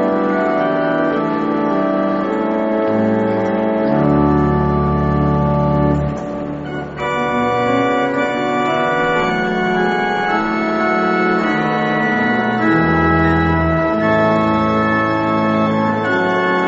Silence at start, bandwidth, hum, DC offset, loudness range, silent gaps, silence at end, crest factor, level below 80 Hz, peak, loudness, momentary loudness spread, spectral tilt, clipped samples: 0 s; 7.8 kHz; none; under 0.1%; 3 LU; none; 0 s; 14 dB; -34 dBFS; -2 dBFS; -16 LUFS; 4 LU; -5.5 dB/octave; under 0.1%